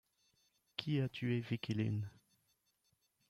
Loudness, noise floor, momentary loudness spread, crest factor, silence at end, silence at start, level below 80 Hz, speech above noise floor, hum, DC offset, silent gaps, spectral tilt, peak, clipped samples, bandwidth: -40 LUFS; -81 dBFS; 8 LU; 22 dB; 1.2 s; 0.8 s; -74 dBFS; 43 dB; none; under 0.1%; none; -7.5 dB/octave; -18 dBFS; under 0.1%; 12 kHz